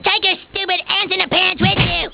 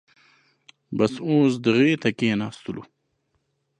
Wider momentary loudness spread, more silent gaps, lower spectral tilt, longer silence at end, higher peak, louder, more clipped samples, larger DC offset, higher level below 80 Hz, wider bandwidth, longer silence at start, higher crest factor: second, 5 LU vs 16 LU; neither; first, -8.5 dB/octave vs -6.5 dB/octave; second, 0 s vs 0.95 s; first, -2 dBFS vs -6 dBFS; first, -15 LUFS vs -22 LUFS; neither; neither; first, -36 dBFS vs -64 dBFS; second, 4 kHz vs 10.5 kHz; second, 0 s vs 0.9 s; about the same, 16 dB vs 18 dB